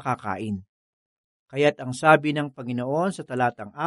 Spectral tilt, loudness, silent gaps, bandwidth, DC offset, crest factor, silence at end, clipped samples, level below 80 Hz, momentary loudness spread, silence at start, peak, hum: -6 dB/octave; -24 LUFS; 0.69-1.46 s; 11.5 kHz; under 0.1%; 22 dB; 0 s; under 0.1%; -68 dBFS; 13 LU; 0 s; -2 dBFS; none